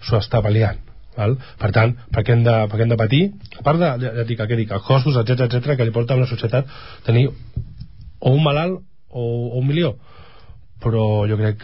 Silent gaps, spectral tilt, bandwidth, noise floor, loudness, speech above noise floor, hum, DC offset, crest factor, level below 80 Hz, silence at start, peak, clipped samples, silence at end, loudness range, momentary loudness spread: none; -12 dB/octave; 5.8 kHz; -45 dBFS; -19 LUFS; 27 dB; none; 0.9%; 14 dB; -40 dBFS; 0 s; -4 dBFS; under 0.1%; 0 s; 3 LU; 13 LU